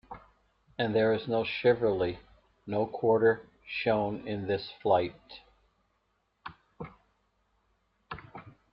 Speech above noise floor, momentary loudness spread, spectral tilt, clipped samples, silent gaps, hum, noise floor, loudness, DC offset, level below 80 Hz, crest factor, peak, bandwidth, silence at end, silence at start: 47 dB; 23 LU; -4.5 dB/octave; under 0.1%; none; 50 Hz at -60 dBFS; -76 dBFS; -29 LUFS; under 0.1%; -62 dBFS; 20 dB; -12 dBFS; 5.6 kHz; 0.25 s; 0.1 s